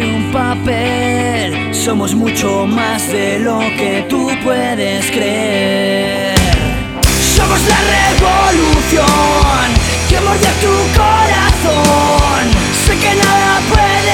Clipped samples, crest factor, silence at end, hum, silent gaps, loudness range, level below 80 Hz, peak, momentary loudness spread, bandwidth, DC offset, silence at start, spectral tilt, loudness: under 0.1%; 12 dB; 0 s; none; none; 4 LU; -20 dBFS; 0 dBFS; 5 LU; 18 kHz; under 0.1%; 0 s; -4 dB/octave; -12 LUFS